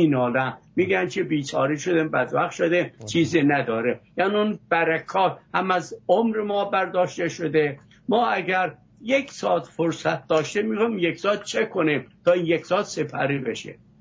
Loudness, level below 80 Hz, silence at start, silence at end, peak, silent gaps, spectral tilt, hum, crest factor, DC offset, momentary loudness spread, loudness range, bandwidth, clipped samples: -23 LUFS; -64 dBFS; 0 s; 0.3 s; -6 dBFS; none; -5.5 dB/octave; none; 16 dB; under 0.1%; 5 LU; 2 LU; 8 kHz; under 0.1%